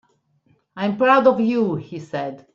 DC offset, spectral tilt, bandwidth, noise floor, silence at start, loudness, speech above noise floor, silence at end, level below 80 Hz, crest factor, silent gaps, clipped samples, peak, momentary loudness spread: under 0.1%; -7.5 dB/octave; 7.4 kHz; -62 dBFS; 0.75 s; -19 LUFS; 43 dB; 0.15 s; -64 dBFS; 18 dB; none; under 0.1%; -2 dBFS; 14 LU